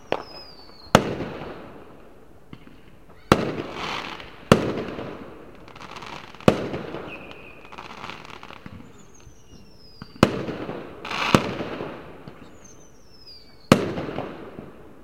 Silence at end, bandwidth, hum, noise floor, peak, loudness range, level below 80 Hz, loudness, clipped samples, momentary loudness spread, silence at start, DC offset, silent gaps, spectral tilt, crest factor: 0 s; 16.5 kHz; none; -50 dBFS; 0 dBFS; 4 LU; -50 dBFS; -25 LUFS; under 0.1%; 24 LU; 0.05 s; 0.4%; none; -5.5 dB/octave; 28 dB